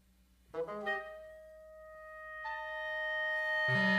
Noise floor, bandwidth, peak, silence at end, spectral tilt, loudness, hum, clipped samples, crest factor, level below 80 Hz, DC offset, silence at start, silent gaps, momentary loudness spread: -67 dBFS; 15 kHz; -20 dBFS; 0 s; -5.5 dB/octave; -36 LUFS; none; under 0.1%; 18 dB; -68 dBFS; under 0.1%; 0.55 s; none; 22 LU